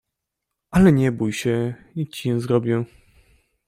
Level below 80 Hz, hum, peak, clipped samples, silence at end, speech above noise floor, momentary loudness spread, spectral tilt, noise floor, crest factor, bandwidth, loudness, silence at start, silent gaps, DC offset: -44 dBFS; none; -2 dBFS; under 0.1%; 0.8 s; 62 dB; 13 LU; -7 dB/octave; -82 dBFS; 20 dB; 15.5 kHz; -21 LUFS; 0.7 s; none; under 0.1%